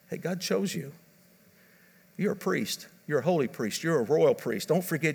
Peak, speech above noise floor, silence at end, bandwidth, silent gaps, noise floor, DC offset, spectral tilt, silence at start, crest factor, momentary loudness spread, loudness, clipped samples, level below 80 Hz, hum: -12 dBFS; 32 dB; 0 s; over 20 kHz; none; -60 dBFS; under 0.1%; -5 dB/octave; 0.1 s; 18 dB; 11 LU; -29 LUFS; under 0.1%; -78 dBFS; none